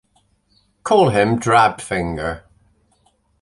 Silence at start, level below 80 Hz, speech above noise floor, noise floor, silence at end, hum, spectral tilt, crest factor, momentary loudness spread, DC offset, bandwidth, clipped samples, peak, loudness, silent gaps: 0.85 s; -44 dBFS; 45 dB; -61 dBFS; 1.05 s; 50 Hz at -50 dBFS; -5.5 dB/octave; 18 dB; 14 LU; under 0.1%; 11.5 kHz; under 0.1%; -2 dBFS; -17 LUFS; none